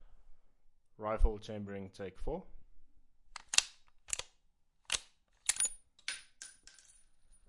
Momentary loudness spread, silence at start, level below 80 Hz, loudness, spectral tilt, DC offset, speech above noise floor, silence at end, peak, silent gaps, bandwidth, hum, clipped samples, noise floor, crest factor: 21 LU; 0 s; -44 dBFS; -37 LUFS; -1.5 dB/octave; under 0.1%; 36 dB; 0.8 s; -6 dBFS; none; 11.5 kHz; none; under 0.1%; -71 dBFS; 34 dB